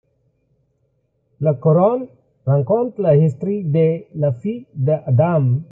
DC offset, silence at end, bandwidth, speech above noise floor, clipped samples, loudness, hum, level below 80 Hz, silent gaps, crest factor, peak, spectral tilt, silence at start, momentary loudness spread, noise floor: under 0.1%; 0.05 s; 3.1 kHz; 49 dB; under 0.1%; -18 LUFS; none; -58 dBFS; none; 16 dB; -2 dBFS; -12 dB/octave; 1.4 s; 10 LU; -66 dBFS